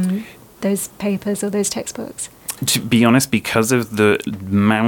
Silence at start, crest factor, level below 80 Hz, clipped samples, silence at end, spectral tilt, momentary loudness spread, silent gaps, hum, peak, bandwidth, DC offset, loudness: 0 s; 18 dB; -54 dBFS; under 0.1%; 0 s; -4.5 dB/octave; 13 LU; none; none; 0 dBFS; 19 kHz; under 0.1%; -18 LUFS